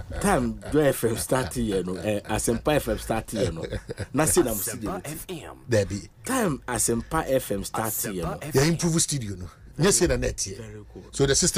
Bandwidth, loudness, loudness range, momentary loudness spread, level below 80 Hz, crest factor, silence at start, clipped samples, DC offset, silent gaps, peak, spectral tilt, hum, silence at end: 16 kHz; -25 LUFS; 2 LU; 13 LU; -40 dBFS; 16 dB; 0 s; under 0.1%; under 0.1%; none; -8 dBFS; -4 dB/octave; none; 0 s